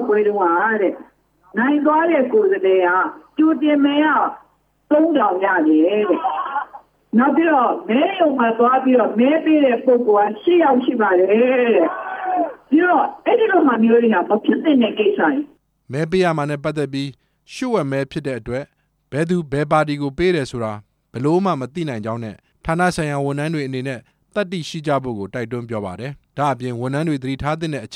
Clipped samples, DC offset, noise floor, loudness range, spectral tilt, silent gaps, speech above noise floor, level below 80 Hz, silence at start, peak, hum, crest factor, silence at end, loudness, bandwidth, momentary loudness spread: under 0.1%; under 0.1%; -42 dBFS; 8 LU; -7 dB/octave; none; 25 dB; -52 dBFS; 0 s; -2 dBFS; none; 14 dB; 0 s; -18 LUFS; 11 kHz; 12 LU